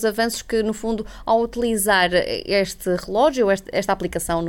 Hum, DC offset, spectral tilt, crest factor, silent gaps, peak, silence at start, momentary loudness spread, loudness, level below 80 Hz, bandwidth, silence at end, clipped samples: none; under 0.1%; -3.5 dB/octave; 14 dB; none; -6 dBFS; 0 s; 7 LU; -21 LUFS; -42 dBFS; 17.5 kHz; 0 s; under 0.1%